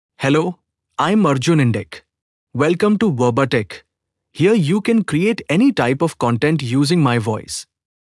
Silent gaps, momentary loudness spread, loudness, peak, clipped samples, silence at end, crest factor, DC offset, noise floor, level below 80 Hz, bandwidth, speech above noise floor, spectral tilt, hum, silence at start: 2.22-2.47 s; 11 LU; -17 LUFS; -4 dBFS; under 0.1%; 0.45 s; 14 dB; under 0.1%; -77 dBFS; -58 dBFS; 12 kHz; 61 dB; -6.5 dB/octave; none; 0.2 s